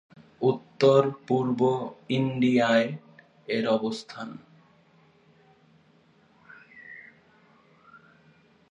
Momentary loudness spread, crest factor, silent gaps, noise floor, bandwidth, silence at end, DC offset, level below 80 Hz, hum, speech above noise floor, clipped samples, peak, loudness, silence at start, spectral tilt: 24 LU; 22 dB; none; -61 dBFS; 8.8 kHz; 1.7 s; under 0.1%; -74 dBFS; none; 36 dB; under 0.1%; -6 dBFS; -25 LUFS; 0.4 s; -6.5 dB/octave